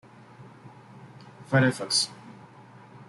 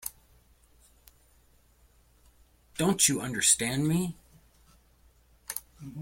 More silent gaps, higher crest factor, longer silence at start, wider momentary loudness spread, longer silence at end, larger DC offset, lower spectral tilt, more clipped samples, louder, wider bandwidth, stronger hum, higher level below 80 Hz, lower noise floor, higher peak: neither; about the same, 20 dB vs 24 dB; first, 0.4 s vs 0.05 s; first, 26 LU vs 21 LU; about the same, 0.05 s vs 0 s; neither; about the same, -4 dB/octave vs -3 dB/octave; neither; about the same, -25 LUFS vs -26 LUFS; second, 12 kHz vs 16.5 kHz; neither; second, -70 dBFS vs -60 dBFS; second, -50 dBFS vs -63 dBFS; about the same, -10 dBFS vs -8 dBFS